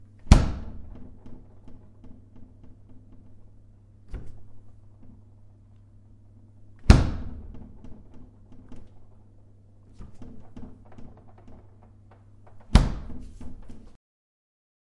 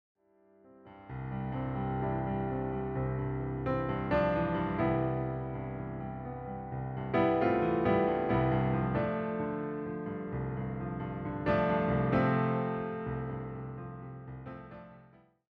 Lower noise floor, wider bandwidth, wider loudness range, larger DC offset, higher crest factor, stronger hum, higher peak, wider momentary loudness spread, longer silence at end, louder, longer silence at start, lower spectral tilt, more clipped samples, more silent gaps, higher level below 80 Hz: second, -52 dBFS vs -64 dBFS; first, 11.5 kHz vs 5 kHz; first, 22 LU vs 5 LU; neither; first, 28 dB vs 16 dB; neither; first, 0 dBFS vs -16 dBFS; first, 30 LU vs 14 LU; first, 0.9 s vs 0.5 s; first, -23 LUFS vs -33 LUFS; second, 0.25 s vs 0.65 s; second, -6.5 dB/octave vs -10.5 dB/octave; neither; neither; first, -32 dBFS vs -50 dBFS